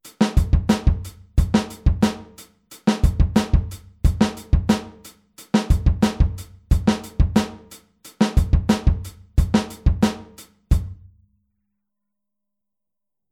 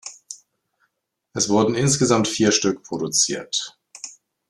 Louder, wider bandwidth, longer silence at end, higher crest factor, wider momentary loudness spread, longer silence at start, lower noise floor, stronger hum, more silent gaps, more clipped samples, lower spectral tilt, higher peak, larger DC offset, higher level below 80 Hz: about the same, -21 LUFS vs -20 LUFS; first, 15.5 kHz vs 13 kHz; first, 2.4 s vs 0.4 s; about the same, 18 dB vs 20 dB; second, 8 LU vs 19 LU; about the same, 0.05 s vs 0.05 s; first, -87 dBFS vs -73 dBFS; neither; neither; neither; first, -6.5 dB/octave vs -3.5 dB/octave; about the same, -4 dBFS vs -2 dBFS; neither; first, -24 dBFS vs -58 dBFS